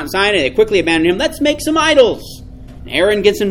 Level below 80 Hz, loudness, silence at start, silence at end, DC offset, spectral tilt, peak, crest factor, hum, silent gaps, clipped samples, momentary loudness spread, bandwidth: -36 dBFS; -13 LUFS; 0 s; 0 s; under 0.1%; -4 dB/octave; 0 dBFS; 14 dB; none; none; under 0.1%; 6 LU; 17 kHz